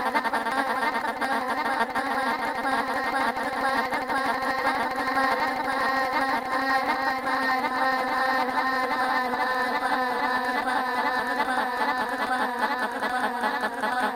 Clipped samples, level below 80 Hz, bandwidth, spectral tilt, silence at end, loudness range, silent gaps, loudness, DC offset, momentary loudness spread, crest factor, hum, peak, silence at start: under 0.1%; -60 dBFS; 17 kHz; -3 dB/octave; 0 s; 1 LU; none; -25 LUFS; under 0.1%; 2 LU; 16 dB; none; -10 dBFS; 0 s